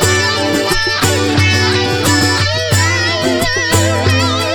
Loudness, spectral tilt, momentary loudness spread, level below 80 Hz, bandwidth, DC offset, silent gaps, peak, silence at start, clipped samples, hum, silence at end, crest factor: -12 LUFS; -3.5 dB/octave; 2 LU; -34 dBFS; over 20 kHz; under 0.1%; none; 0 dBFS; 0 s; under 0.1%; none; 0 s; 12 dB